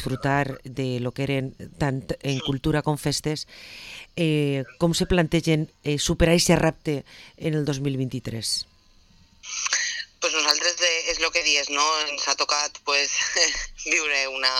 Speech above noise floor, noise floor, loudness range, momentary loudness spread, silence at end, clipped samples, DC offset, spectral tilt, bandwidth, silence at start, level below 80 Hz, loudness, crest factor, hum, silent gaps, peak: 31 dB; -56 dBFS; 6 LU; 10 LU; 0 s; under 0.1%; under 0.1%; -3.5 dB/octave; 16 kHz; 0 s; -42 dBFS; -23 LUFS; 22 dB; none; none; -4 dBFS